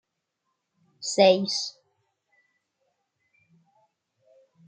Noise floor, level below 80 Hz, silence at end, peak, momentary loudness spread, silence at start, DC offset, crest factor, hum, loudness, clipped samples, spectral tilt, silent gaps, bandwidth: -80 dBFS; -82 dBFS; 3 s; -6 dBFS; 16 LU; 1 s; under 0.1%; 24 dB; none; -23 LUFS; under 0.1%; -3.5 dB/octave; none; 9.4 kHz